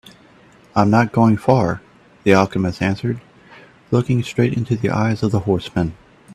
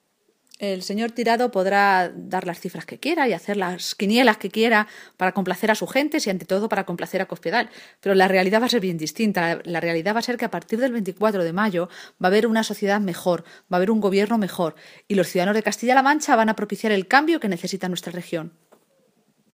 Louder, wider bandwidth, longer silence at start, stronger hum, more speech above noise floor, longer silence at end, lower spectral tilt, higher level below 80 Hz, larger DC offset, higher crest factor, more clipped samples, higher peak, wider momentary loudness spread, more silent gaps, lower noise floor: first, -18 LUFS vs -22 LUFS; second, 12.5 kHz vs 15.5 kHz; first, 0.75 s vs 0.6 s; neither; second, 32 dB vs 45 dB; second, 0 s vs 1.05 s; first, -7.5 dB/octave vs -4.5 dB/octave; first, -48 dBFS vs -72 dBFS; neither; about the same, 18 dB vs 22 dB; neither; about the same, 0 dBFS vs 0 dBFS; about the same, 8 LU vs 10 LU; neither; second, -48 dBFS vs -66 dBFS